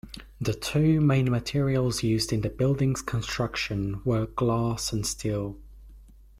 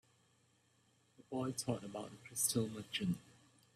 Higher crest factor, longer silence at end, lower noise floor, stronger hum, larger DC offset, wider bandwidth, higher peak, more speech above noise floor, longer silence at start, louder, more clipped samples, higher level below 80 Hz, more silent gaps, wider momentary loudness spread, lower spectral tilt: second, 14 dB vs 24 dB; about the same, 0.35 s vs 0.45 s; second, -50 dBFS vs -74 dBFS; neither; neither; about the same, 15 kHz vs 15.5 kHz; first, -12 dBFS vs -20 dBFS; second, 24 dB vs 34 dB; second, 0.05 s vs 1.3 s; first, -27 LUFS vs -40 LUFS; neither; first, -46 dBFS vs -76 dBFS; neither; second, 8 LU vs 11 LU; first, -5.5 dB/octave vs -4 dB/octave